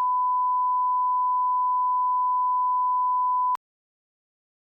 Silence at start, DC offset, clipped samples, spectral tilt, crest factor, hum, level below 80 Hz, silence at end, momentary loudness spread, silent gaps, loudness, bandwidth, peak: 0 s; under 0.1%; under 0.1%; 0 dB/octave; 4 dB; none; under -90 dBFS; 1.05 s; 0 LU; none; -23 LUFS; 2.2 kHz; -20 dBFS